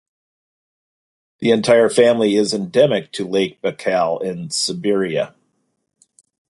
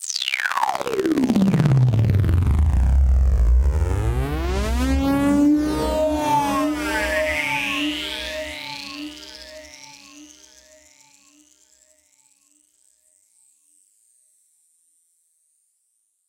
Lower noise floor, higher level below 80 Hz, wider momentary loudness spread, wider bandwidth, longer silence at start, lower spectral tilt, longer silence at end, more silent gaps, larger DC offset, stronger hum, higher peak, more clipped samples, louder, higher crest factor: about the same, -69 dBFS vs -70 dBFS; second, -62 dBFS vs -26 dBFS; second, 9 LU vs 17 LU; second, 11.5 kHz vs 16.5 kHz; first, 1.4 s vs 0 s; second, -4.5 dB/octave vs -6 dB/octave; second, 1.2 s vs 6.05 s; neither; neither; neither; about the same, -2 dBFS vs -4 dBFS; neither; first, -17 LUFS vs -20 LUFS; about the same, 16 dB vs 18 dB